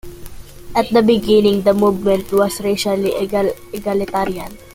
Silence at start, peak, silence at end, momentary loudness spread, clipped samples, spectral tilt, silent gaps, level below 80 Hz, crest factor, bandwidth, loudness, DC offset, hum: 0.05 s; -2 dBFS; 0.05 s; 9 LU; under 0.1%; -5.5 dB/octave; none; -40 dBFS; 16 dB; 17 kHz; -16 LUFS; under 0.1%; none